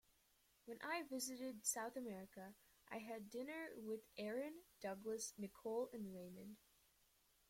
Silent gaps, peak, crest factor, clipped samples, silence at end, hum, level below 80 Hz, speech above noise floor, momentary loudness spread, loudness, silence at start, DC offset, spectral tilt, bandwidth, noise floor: none; -30 dBFS; 22 dB; under 0.1%; 0.9 s; none; -84 dBFS; 29 dB; 14 LU; -49 LUFS; 0.65 s; under 0.1%; -3 dB/octave; 16.5 kHz; -78 dBFS